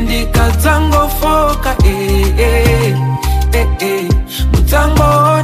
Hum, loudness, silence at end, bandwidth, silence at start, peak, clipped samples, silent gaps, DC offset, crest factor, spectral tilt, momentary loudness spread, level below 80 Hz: none; -12 LUFS; 0 s; 16 kHz; 0 s; 0 dBFS; under 0.1%; none; under 0.1%; 10 dB; -5.5 dB/octave; 5 LU; -14 dBFS